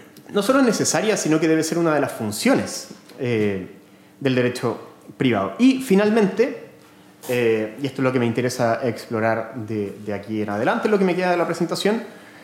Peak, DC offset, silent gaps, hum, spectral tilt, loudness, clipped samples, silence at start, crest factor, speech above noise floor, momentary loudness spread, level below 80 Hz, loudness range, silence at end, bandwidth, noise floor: -6 dBFS; under 0.1%; none; none; -5 dB/octave; -21 LUFS; under 0.1%; 0 s; 14 dB; 28 dB; 11 LU; -74 dBFS; 3 LU; 0 s; 17 kHz; -48 dBFS